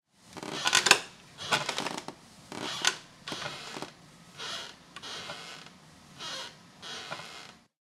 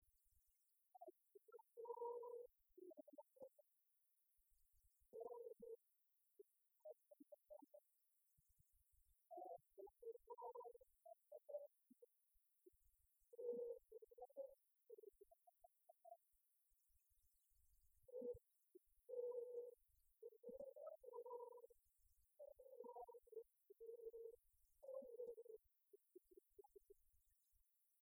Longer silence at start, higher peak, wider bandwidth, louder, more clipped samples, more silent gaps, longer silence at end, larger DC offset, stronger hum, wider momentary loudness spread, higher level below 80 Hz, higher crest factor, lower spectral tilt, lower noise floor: about the same, 0.25 s vs 0.35 s; first, -2 dBFS vs -40 dBFS; second, 16 kHz vs over 20 kHz; first, -31 LUFS vs -59 LUFS; neither; neither; second, 0.25 s vs 0.85 s; neither; neither; first, 22 LU vs 14 LU; first, -74 dBFS vs -88 dBFS; first, 34 dB vs 22 dB; second, -0.5 dB/octave vs -6.5 dB/octave; second, -54 dBFS vs -86 dBFS